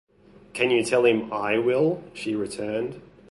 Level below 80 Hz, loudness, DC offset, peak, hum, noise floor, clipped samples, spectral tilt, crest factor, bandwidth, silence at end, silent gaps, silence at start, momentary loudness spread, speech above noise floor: -60 dBFS; -24 LUFS; under 0.1%; -8 dBFS; none; -44 dBFS; under 0.1%; -5 dB/octave; 18 dB; 11.5 kHz; 0.25 s; none; 0.55 s; 10 LU; 21 dB